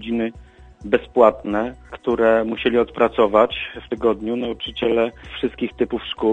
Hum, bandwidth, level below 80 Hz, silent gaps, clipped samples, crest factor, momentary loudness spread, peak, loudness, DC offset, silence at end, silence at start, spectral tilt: none; 8 kHz; -46 dBFS; none; under 0.1%; 20 dB; 11 LU; 0 dBFS; -20 LUFS; under 0.1%; 0 s; 0 s; -7 dB/octave